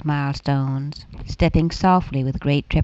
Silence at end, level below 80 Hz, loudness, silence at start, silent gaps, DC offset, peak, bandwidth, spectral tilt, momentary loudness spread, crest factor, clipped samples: 0 s; -32 dBFS; -21 LUFS; 0 s; none; under 0.1%; -4 dBFS; 7.8 kHz; -7.5 dB/octave; 12 LU; 16 dB; under 0.1%